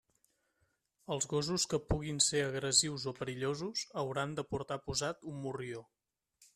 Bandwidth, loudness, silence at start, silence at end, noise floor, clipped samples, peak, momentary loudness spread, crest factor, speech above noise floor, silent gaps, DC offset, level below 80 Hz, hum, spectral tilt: 14 kHz; -35 LUFS; 1.1 s; 0.7 s; -79 dBFS; under 0.1%; -14 dBFS; 12 LU; 24 dB; 43 dB; none; under 0.1%; -56 dBFS; none; -3 dB/octave